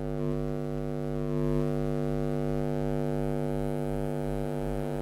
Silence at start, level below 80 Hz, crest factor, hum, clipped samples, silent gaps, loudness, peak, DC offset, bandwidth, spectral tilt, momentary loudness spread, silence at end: 0 s; -42 dBFS; 14 dB; none; under 0.1%; none; -31 LUFS; -16 dBFS; under 0.1%; 15 kHz; -8.5 dB/octave; 4 LU; 0 s